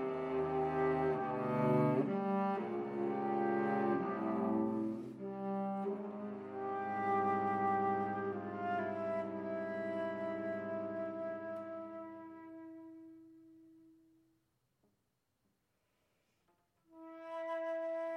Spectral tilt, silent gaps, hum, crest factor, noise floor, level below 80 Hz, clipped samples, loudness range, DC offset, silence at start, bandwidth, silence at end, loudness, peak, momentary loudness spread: -9 dB/octave; none; none; 18 dB; -83 dBFS; -74 dBFS; under 0.1%; 15 LU; under 0.1%; 0 s; 6.4 kHz; 0 s; -38 LUFS; -20 dBFS; 15 LU